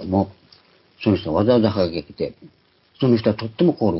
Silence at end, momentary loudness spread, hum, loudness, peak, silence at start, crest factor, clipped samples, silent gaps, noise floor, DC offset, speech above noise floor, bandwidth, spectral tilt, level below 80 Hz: 0 s; 12 LU; none; -21 LUFS; -4 dBFS; 0 s; 16 dB; under 0.1%; none; -54 dBFS; under 0.1%; 34 dB; 5.8 kHz; -11.5 dB/octave; -44 dBFS